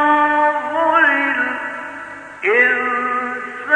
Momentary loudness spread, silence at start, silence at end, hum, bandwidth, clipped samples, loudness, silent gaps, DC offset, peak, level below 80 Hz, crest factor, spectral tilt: 15 LU; 0 s; 0 s; none; 10 kHz; under 0.1%; -16 LUFS; none; under 0.1%; -2 dBFS; -66 dBFS; 16 dB; -4 dB/octave